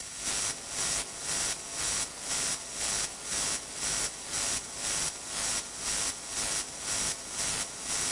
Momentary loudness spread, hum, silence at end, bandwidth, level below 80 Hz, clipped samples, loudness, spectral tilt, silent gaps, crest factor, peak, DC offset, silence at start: 2 LU; none; 0 s; 11.5 kHz; -54 dBFS; under 0.1%; -31 LUFS; 0 dB/octave; none; 20 dB; -14 dBFS; under 0.1%; 0 s